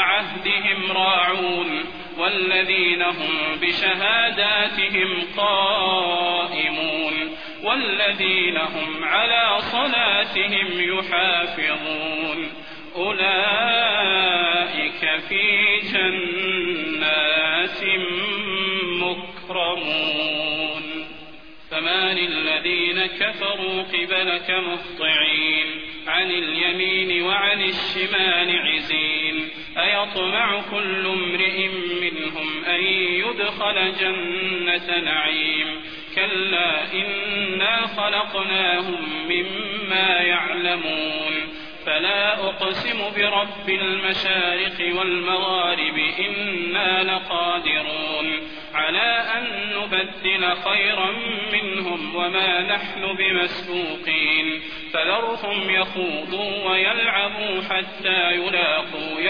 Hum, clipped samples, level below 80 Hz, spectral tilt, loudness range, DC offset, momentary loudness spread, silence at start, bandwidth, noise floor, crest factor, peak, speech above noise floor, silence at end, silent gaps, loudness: none; under 0.1%; -58 dBFS; -5 dB/octave; 3 LU; 0.7%; 7 LU; 0 s; 5.2 kHz; -43 dBFS; 16 dB; -6 dBFS; 21 dB; 0 s; none; -20 LUFS